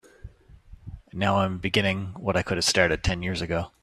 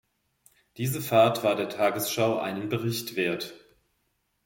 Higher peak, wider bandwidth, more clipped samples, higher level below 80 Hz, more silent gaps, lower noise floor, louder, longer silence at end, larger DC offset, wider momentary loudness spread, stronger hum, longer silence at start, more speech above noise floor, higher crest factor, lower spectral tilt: first, -4 dBFS vs -8 dBFS; second, 14.5 kHz vs 17 kHz; neither; first, -44 dBFS vs -68 dBFS; neither; second, -49 dBFS vs -75 dBFS; about the same, -25 LUFS vs -26 LUFS; second, 0.15 s vs 0.85 s; neither; about the same, 11 LU vs 10 LU; neither; second, 0.25 s vs 0.75 s; second, 24 dB vs 48 dB; about the same, 22 dB vs 20 dB; about the same, -4 dB/octave vs -4.5 dB/octave